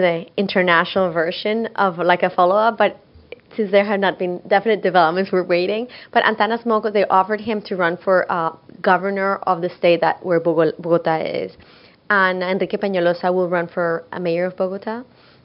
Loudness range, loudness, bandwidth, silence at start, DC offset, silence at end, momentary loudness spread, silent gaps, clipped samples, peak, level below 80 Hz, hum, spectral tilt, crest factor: 2 LU; -19 LUFS; 5.6 kHz; 0 s; under 0.1%; 0.4 s; 8 LU; none; under 0.1%; 0 dBFS; -64 dBFS; none; -8.5 dB/octave; 18 dB